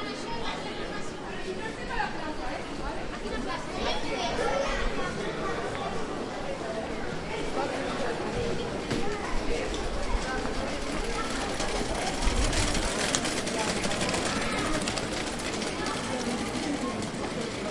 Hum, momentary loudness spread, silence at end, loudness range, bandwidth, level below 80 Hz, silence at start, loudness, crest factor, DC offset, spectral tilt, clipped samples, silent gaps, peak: none; 7 LU; 0 s; 5 LU; 11.5 kHz; -38 dBFS; 0 s; -31 LUFS; 26 dB; under 0.1%; -3.5 dB/octave; under 0.1%; none; -4 dBFS